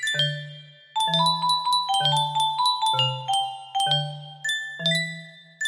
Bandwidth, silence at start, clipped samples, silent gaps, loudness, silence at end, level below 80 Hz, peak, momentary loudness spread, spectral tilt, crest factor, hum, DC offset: 15.5 kHz; 0 s; under 0.1%; none; -23 LUFS; 0 s; -72 dBFS; -10 dBFS; 11 LU; -2.5 dB/octave; 16 dB; none; under 0.1%